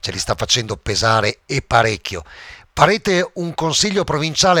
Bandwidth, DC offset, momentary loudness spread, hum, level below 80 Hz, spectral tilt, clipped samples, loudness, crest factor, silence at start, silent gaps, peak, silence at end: 18 kHz; under 0.1%; 13 LU; none; -40 dBFS; -3.5 dB/octave; under 0.1%; -17 LUFS; 18 dB; 0.05 s; none; 0 dBFS; 0 s